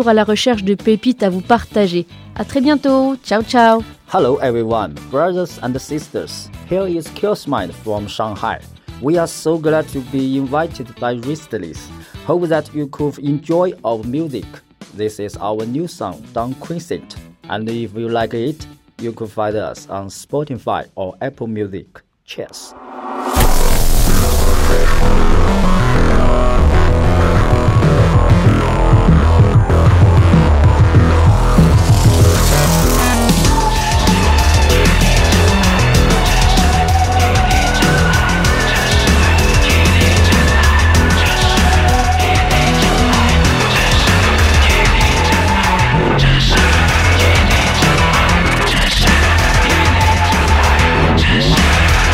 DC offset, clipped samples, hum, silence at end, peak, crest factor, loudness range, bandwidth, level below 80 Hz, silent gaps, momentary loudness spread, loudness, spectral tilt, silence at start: under 0.1%; under 0.1%; none; 0 s; 0 dBFS; 12 dB; 11 LU; 16.5 kHz; -18 dBFS; none; 13 LU; -13 LUFS; -5 dB/octave; 0 s